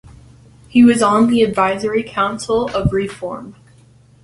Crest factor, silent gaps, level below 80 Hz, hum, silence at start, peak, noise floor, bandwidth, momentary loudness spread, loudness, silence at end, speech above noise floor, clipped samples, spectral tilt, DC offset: 16 dB; none; -40 dBFS; none; 0.75 s; -2 dBFS; -48 dBFS; 11.5 kHz; 14 LU; -15 LUFS; 0.7 s; 33 dB; under 0.1%; -6 dB/octave; under 0.1%